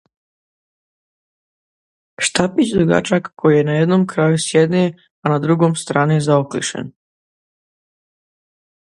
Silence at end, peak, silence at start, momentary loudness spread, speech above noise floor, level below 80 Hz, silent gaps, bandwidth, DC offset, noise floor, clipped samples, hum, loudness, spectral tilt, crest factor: 1.9 s; 0 dBFS; 2.2 s; 8 LU; over 75 dB; -54 dBFS; 5.11-5.23 s; 11.5 kHz; under 0.1%; under -90 dBFS; under 0.1%; none; -16 LUFS; -5.5 dB/octave; 18 dB